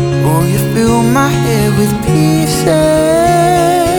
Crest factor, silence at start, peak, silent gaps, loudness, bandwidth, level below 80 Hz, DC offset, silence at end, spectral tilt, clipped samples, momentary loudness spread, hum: 10 dB; 0 s; 0 dBFS; none; -11 LUFS; over 20 kHz; -30 dBFS; under 0.1%; 0 s; -6 dB/octave; under 0.1%; 2 LU; none